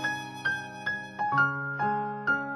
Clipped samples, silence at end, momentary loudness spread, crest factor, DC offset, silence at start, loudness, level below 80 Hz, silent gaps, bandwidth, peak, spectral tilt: under 0.1%; 0 s; 7 LU; 16 dB; under 0.1%; 0 s; -29 LUFS; -70 dBFS; none; 12.5 kHz; -12 dBFS; -5 dB/octave